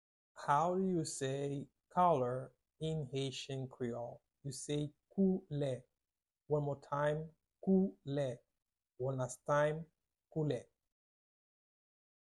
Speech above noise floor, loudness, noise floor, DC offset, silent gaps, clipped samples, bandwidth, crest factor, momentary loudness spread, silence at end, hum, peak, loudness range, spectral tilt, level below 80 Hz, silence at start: over 53 dB; -38 LUFS; under -90 dBFS; under 0.1%; none; under 0.1%; 11.5 kHz; 20 dB; 13 LU; 1.6 s; none; -20 dBFS; 4 LU; -6 dB/octave; -70 dBFS; 0.35 s